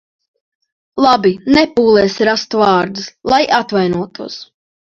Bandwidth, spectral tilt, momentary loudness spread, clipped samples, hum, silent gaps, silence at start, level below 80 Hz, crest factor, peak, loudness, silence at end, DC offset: 7.6 kHz; -5 dB/octave; 15 LU; under 0.1%; none; none; 0.95 s; -48 dBFS; 14 dB; 0 dBFS; -13 LUFS; 0.45 s; under 0.1%